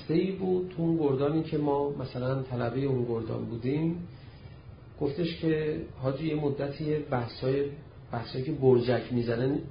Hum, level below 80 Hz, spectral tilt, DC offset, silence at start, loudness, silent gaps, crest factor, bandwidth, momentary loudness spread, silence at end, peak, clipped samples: none; -54 dBFS; -11.5 dB/octave; under 0.1%; 0 s; -30 LUFS; none; 20 dB; 5.2 kHz; 12 LU; 0 s; -10 dBFS; under 0.1%